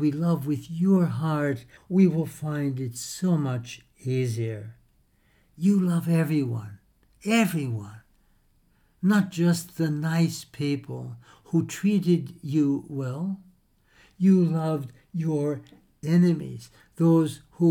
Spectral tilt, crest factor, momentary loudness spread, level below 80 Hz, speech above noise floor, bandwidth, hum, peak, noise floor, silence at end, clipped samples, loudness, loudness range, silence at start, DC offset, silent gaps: -7 dB/octave; 16 dB; 14 LU; -64 dBFS; 39 dB; 18.5 kHz; none; -8 dBFS; -64 dBFS; 0 s; under 0.1%; -25 LUFS; 2 LU; 0 s; under 0.1%; none